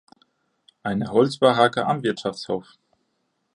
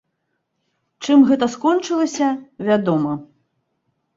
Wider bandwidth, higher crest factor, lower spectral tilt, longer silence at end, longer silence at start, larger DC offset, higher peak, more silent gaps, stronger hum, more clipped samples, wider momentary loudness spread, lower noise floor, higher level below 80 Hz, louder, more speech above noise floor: first, 11 kHz vs 7.8 kHz; about the same, 20 dB vs 16 dB; about the same, -6 dB/octave vs -5.5 dB/octave; about the same, 0.95 s vs 0.9 s; second, 0.85 s vs 1 s; neither; about the same, -2 dBFS vs -4 dBFS; neither; neither; neither; about the same, 12 LU vs 12 LU; about the same, -73 dBFS vs -73 dBFS; about the same, -62 dBFS vs -62 dBFS; second, -22 LUFS vs -18 LUFS; second, 52 dB vs 56 dB